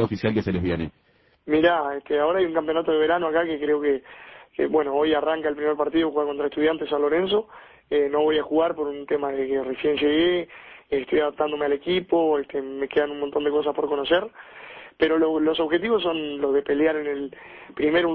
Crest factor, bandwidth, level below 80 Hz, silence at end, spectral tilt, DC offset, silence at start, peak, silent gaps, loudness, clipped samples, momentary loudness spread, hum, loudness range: 18 dB; 5.8 kHz; -52 dBFS; 0 s; -8 dB/octave; under 0.1%; 0 s; -6 dBFS; none; -23 LUFS; under 0.1%; 9 LU; none; 1 LU